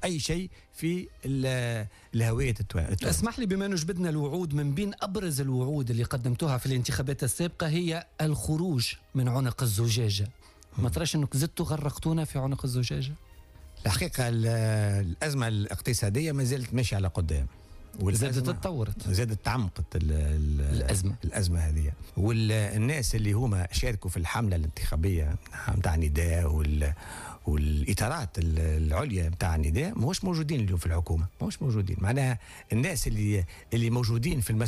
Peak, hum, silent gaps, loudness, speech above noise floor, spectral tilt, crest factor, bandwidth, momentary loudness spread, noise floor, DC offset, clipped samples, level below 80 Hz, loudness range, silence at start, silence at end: -16 dBFS; none; none; -29 LUFS; 22 dB; -5.5 dB/octave; 12 dB; 15.5 kHz; 5 LU; -50 dBFS; under 0.1%; under 0.1%; -38 dBFS; 2 LU; 0 s; 0 s